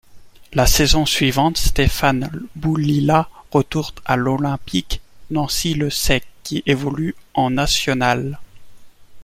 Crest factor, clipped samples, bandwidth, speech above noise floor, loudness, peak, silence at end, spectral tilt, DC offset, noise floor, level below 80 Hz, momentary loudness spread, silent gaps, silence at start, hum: 18 dB; under 0.1%; 16.5 kHz; 20 dB; -19 LUFS; -2 dBFS; 0 s; -4.5 dB/octave; under 0.1%; -38 dBFS; -28 dBFS; 9 LU; none; 0.1 s; none